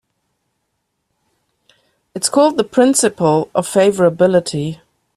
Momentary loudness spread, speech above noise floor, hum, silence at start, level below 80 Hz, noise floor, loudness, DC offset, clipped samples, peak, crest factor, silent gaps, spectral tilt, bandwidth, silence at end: 11 LU; 57 dB; none; 2.15 s; -58 dBFS; -71 dBFS; -14 LUFS; under 0.1%; under 0.1%; 0 dBFS; 16 dB; none; -4.5 dB/octave; 14.5 kHz; 0.4 s